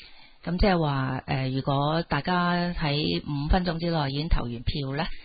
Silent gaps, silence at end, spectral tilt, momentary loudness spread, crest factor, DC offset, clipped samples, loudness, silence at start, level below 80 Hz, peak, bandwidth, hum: none; 0 s; -11 dB/octave; 6 LU; 18 dB; under 0.1%; under 0.1%; -27 LUFS; 0 s; -34 dBFS; -8 dBFS; 5 kHz; none